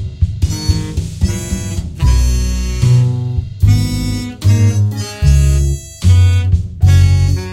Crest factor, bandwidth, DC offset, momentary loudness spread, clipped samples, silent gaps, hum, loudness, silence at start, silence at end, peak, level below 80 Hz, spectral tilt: 12 dB; 14.5 kHz; under 0.1%; 8 LU; under 0.1%; none; none; -14 LUFS; 0 s; 0 s; 0 dBFS; -18 dBFS; -6 dB/octave